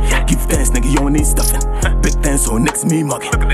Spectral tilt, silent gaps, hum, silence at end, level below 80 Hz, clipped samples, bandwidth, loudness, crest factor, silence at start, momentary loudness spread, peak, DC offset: -4.5 dB/octave; none; none; 0 s; -16 dBFS; under 0.1%; 15 kHz; -15 LUFS; 12 dB; 0 s; 3 LU; 0 dBFS; under 0.1%